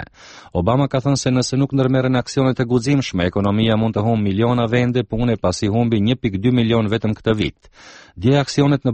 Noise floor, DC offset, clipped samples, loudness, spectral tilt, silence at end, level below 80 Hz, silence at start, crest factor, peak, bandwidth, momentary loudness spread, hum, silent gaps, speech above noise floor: -42 dBFS; under 0.1%; under 0.1%; -18 LUFS; -6.5 dB/octave; 0 s; -42 dBFS; 0 s; 14 dB; -2 dBFS; 8.8 kHz; 4 LU; none; none; 25 dB